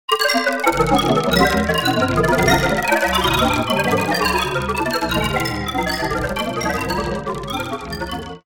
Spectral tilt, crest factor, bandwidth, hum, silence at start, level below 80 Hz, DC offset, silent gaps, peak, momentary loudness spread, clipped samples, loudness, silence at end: -4.5 dB/octave; 18 dB; 17.5 kHz; none; 0.1 s; -34 dBFS; 0.5%; none; -2 dBFS; 9 LU; under 0.1%; -18 LUFS; 0.05 s